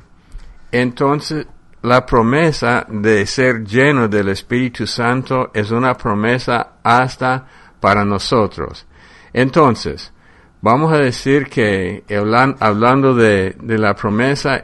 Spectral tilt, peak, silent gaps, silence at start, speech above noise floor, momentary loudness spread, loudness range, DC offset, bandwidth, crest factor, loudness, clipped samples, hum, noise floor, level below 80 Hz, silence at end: -6 dB/octave; 0 dBFS; none; 0.35 s; 21 dB; 8 LU; 3 LU; under 0.1%; 11.5 kHz; 16 dB; -15 LUFS; under 0.1%; none; -35 dBFS; -40 dBFS; 0 s